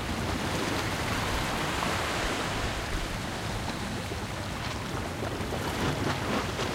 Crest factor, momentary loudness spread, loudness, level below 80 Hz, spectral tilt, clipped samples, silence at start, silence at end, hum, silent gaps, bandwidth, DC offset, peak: 16 dB; 5 LU; -31 LUFS; -42 dBFS; -4 dB/octave; under 0.1%; 0 s; 0 s; none; none; 16 kHz; under 0.1%; -14 dBFS